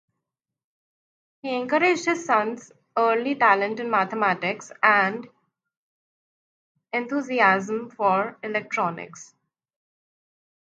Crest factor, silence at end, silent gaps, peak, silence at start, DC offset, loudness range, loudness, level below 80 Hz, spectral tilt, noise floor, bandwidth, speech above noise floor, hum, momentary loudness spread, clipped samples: 22 dB; 1.4 s; 5.77-6.75 s; -2 dBFS; 1.45 s; under 0.1%; 3 LU; -23 LUFS; -80 dBFS; -4.5 dB/octave; -85 dBFS; 9.2 kHz; 62 dB; none; 11 LU; under 0.1%